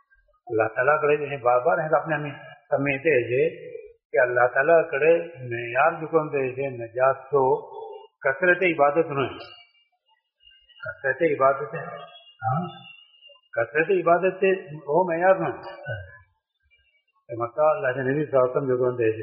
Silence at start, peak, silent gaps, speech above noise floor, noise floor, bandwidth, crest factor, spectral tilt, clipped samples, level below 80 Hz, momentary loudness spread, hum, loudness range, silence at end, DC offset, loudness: 0.45 s; -6 dBFS; 4.05-4.10 s; 46 dB; -69 dBFS; 5 kHz; 18 dB; -5 dB/octave; under 0.1%; -66 dBFS; 16 LU; none; 5 LU; 0 s; under 0.1%; -23 LUFS